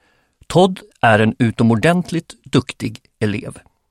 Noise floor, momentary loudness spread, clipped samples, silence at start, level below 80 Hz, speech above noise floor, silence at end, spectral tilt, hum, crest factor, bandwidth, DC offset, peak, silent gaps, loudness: -54 dBFS; 13 LU; under 0.1%; 0.5 s; -48 dBFS; 38 dB; 0.3 s; -6.5 dB/octave; none; 16 dB; 14 kHz; under 0.1%; 0 dBFS; none; -17 LUFS